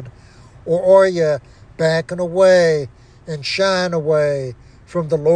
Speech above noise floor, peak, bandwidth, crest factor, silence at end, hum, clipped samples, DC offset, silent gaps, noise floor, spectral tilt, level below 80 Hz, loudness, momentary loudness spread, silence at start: 28 dB; -2 dBFS; 9.8 kHz; 16 dB; 0 s; none; under 0.1%; under 0.1%; none; -43 dBFS; -5.5 dB/octave; -50 dBFS; -16 LUFS; 14 LU; 0 s